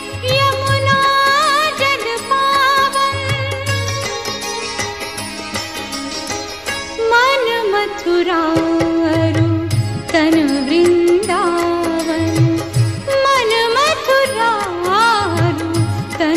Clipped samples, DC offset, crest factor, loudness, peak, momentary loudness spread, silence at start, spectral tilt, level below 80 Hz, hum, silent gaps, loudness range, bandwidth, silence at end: under 0.1%; 0.3%; 14 dB; -15 LUFS; -2 dBFS; 10 LU; 0 s; -4.5 dB/octave; -40 dBFS; none; none; 6 LU; 15 kHz; 0 s